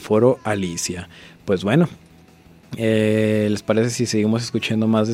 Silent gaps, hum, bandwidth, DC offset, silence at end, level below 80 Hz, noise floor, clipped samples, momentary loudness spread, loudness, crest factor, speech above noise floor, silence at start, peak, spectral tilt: none; none; 15 kHz; under 0.1%; 0 s; -56 dBFS; -48 dBFS; under 0.1%; 9 LU; -20 LUFS; 18 dB; 29 dB; 0 s; -2 dBFS; -5.5 dB/octave